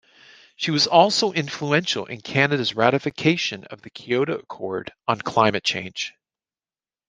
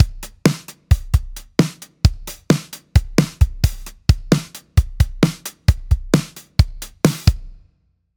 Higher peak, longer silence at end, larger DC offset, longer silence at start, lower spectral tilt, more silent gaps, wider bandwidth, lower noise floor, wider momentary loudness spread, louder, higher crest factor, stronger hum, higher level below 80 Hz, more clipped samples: about the same, -2 dBFS vs 0 dBFS; first, 1 s vs 0.65 s; neither; first, 0.6 s vs 0 s; second, -4 dB/octave vs -6 dB/octave; neither; second, 10 kHz vs over 20 kHz; first, under -90 dBFS vs -63 dBFS; first, 13 LU vs 5 LU; about the same, -22 LUFS vs -20 LUFS; about the same, 22 dB vs 18 dB; neither; second, -64 dBFS vs -24 dBFS; neither